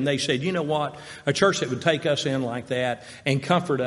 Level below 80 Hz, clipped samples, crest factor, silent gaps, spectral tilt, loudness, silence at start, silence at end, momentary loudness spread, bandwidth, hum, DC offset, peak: -62 dBFS; under 0.1%; 20 dB; none; -5 dB/octave; -25 LUFS; 0 s; 0 s; 7 LU; 11.5 kHz; none; under 0.1%; -4 dBFS